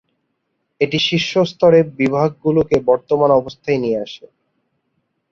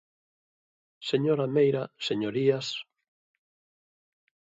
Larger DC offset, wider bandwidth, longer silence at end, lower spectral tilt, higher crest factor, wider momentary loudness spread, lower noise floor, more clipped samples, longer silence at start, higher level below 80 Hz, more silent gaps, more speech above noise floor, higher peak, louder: neither; about the same, 7.4 kHz vs 7.8 kHz; second, 1.15 s vs 1.7 s; about the same, -6 dB/octave vs -6 dB/octave; about the same, 16 dB vs 20 dB; about the same, 9 LU vs 10 LU; second, -71 dBFS vs under -90 dBFS; neither; second, 0.8 s vs 1 s; first, -50 dBFS vs -76 dBFS; neither; second, 55 dB vs over 64 dB; first, -2 dBFS vs -12 dBFS; first, -16 LUFS vs -27 LUFS